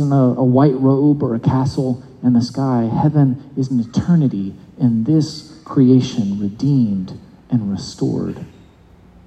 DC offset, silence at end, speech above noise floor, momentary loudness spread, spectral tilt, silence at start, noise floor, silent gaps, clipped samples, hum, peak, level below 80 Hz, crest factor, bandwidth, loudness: under 0.1%; 0.8 s; 30 dB; 11 LU; -8.5 dB/octave; 0 s; -46 dBFS; none; under 0.1%; none; 0 dBFS; -52 dBFS; 16 dB; 8.6 kHz; -17 LUFS